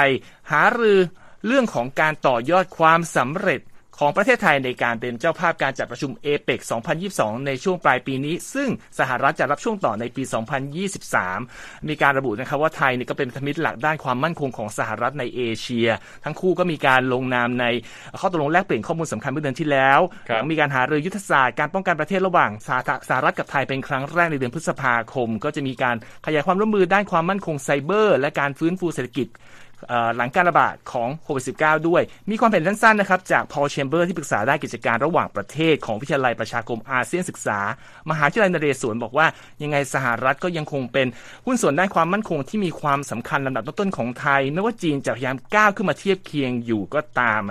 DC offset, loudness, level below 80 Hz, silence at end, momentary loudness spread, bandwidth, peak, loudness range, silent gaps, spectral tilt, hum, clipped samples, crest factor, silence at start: under 0.1%; -21 LUFS; -56 dBFS; 0 s; 9 LU; 14 kHz; 0 dBFS; 4 LU; none; -5 dB/octave; none; under 0.1%; 22 dB; 0 s